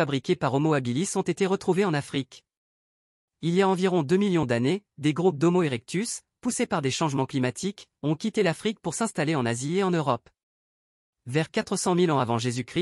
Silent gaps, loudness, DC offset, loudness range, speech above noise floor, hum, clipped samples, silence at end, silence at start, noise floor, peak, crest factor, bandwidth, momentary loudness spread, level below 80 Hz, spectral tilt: 2.57-3.28 s, 10.43-11.13 s; -26 LUFS; under 0.1%; 3 LU; over 65 dB; none; under 0.1%; 0 s; 0 s; under -90 dBFS; -10 dBFS; 16 dB; 12 kHz; 7 LU; -64 dBFS; -5.5 dB/octave